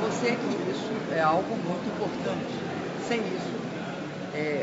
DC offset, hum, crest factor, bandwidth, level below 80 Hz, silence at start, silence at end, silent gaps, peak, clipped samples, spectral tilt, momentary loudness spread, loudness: under 0.1%; none; 18 dB; 8 kHz; -68 dBFS; 0 s; 0 s; none; -12 dBFS; under 0.1%; -4.5 dB/octave; 9 LU; -30 LUFS